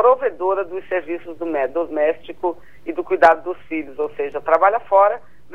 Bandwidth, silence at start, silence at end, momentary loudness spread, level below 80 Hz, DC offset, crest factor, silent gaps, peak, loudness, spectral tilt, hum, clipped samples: 7.6 kHz; 0 s; 0.35 s; 13 LU; -58 dBFS; 1%; 18 dB; none; -2 dBFS; -20 LUFS; -6 dB/octave; none; under 0.1%